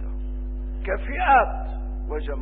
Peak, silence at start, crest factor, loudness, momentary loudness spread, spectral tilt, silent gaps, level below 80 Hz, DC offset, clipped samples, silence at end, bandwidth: -6 dBFS; 0 s; 18 dB; -25 LUFS; 15 LU; -10.5 dB/octave; none; -28 dBFS; 0.3%; under 0.1%; 0 s; 3.9 kHz